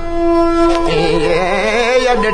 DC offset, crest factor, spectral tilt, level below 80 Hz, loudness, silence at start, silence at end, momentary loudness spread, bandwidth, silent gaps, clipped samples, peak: under 0.1%; 12 dB; -5 dB/octave; -24 dBFS; -13 LUFS; 0 s; 0 s; 2 LU; 10.5 kHz; none; under 0.1%; 0 dBFS